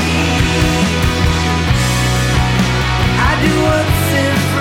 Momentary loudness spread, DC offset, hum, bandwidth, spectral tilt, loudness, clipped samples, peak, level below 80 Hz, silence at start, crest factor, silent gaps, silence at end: 2 LU; under 0.1%; none; 16.5 kHz; -5 dB/octave; -13 LUFS; under 0.1%; -2 dBFS; -22 dBFS; 0 s; 10 dB; none; 0 s